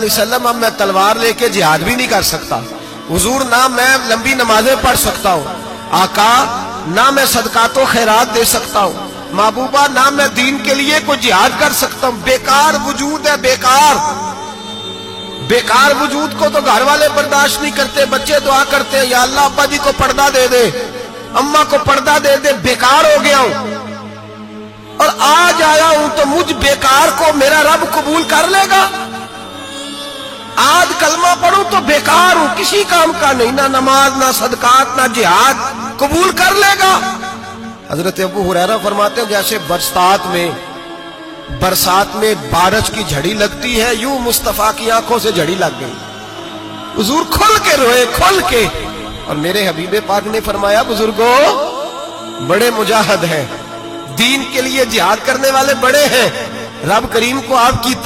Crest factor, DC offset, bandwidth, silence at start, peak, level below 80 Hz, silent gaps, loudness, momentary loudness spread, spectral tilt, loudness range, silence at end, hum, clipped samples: 12 dB; 0.2%; 17 kHz; 0 s; 0 dBFS; -36 dBFS; none; -11 LUFS; 15 LU; -2.5 dB/octave; 4 LU; 0 s; none; under 0.1%